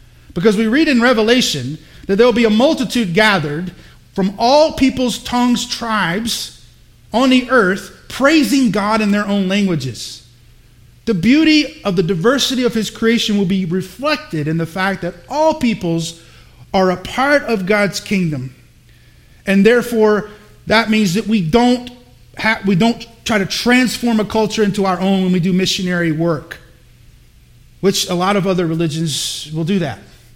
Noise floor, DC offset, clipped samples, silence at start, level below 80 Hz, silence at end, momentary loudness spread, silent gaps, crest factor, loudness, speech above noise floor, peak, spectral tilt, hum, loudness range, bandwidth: -46 dBFS; under 0.1%; under 0.1%; 0.3 s; -44 dBFS; 0.35 s; 12 LU; none; 16 dB; -15 LUFS; 31 dB; 0 dBFS; -5 dB/octave; none; 4 LU; 16.5 kHz